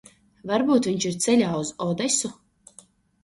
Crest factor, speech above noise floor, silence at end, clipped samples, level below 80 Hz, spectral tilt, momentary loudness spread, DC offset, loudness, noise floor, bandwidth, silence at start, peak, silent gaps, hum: 18 dB; 31 dB; 0.9 s; under 0.1%; -62 dBFS; -4 dB/octave; 7 LU; under 0.1%; -23 LUFS; -54 dBFS; 11.5 kHz; 0.45 s; -8 dBFS; none; none